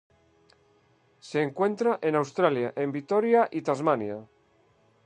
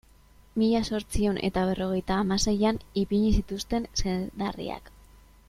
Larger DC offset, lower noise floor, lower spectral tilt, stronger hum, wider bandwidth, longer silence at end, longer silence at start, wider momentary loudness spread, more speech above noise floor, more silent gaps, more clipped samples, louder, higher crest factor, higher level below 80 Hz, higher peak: neither; first, -64 dBFS vs -56 dBFS; about the same, -6.5 dB/octave vs -5.5 dB/octave; neither; second, 9.8 kHz vs 14.5 kHz; first, 0.8 s vs 0.6 s; first, 1.25 s vs 0.55 s; about the same, 8 LU vs 8 LU; first, 39 dB vs 29 dB; neither; neither; about the same, -26 LUFS vs -28 LUFS; about the same, 20 dB vs 16 dB; second, -76 dBFS vs -38 dBFS; first, -8 dBFS vs -12 dBFS